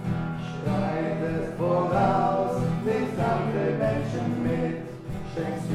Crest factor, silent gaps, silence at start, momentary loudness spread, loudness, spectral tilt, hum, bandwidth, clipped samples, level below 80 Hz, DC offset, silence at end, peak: 16 dB; none; 0 s; 9 LU; -27 LUFS; -8 dB/octave; none; 13 kHz; under 0.1%; -46 dBFS; under 0.1%; 0 s; -10 dBFS